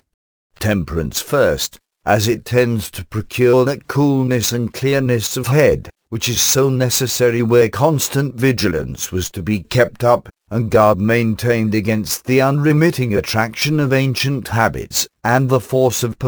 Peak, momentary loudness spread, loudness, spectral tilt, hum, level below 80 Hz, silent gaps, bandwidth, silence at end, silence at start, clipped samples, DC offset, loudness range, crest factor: 0 dBFS; 9 LU; -16 LUFS; -5 dB/octave; none; -42 dBFS; none; over 20 kHz; 0 s; 0.6 s; under 0.1%; under 0.1%; 2 LU; 16 dB